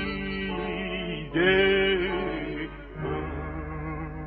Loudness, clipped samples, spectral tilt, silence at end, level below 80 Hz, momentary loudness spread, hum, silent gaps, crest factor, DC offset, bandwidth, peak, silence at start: -27 LUFS; under 0.1%; -3.5 dB/octave; 0 s; -42 dBFS; 14 LU; none; none; 16 dB; under 0.1%; 4.9 kHz; -10 dBFS; 0 s